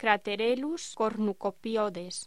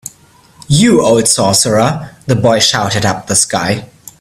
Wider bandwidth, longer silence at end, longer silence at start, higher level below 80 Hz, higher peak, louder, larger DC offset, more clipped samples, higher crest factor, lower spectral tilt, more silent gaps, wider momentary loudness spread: second, 13 kHz vs over 20 kHz; second, 0 s vs 0.35 s; second, 0 s vs 0.7 s; second, -70 dBFS vs -42 dBFS; second, -8 dBFS vs 0 dBFS; second, -30 LUFS vs -11 LUFS; first, 0.2% vs under 0.1%; neither; first, 22 dB vs 12 dB; about the same, -4 dB/octave vs -3.5 dB/octave; neither; about the same, 6 LU vs 8 LU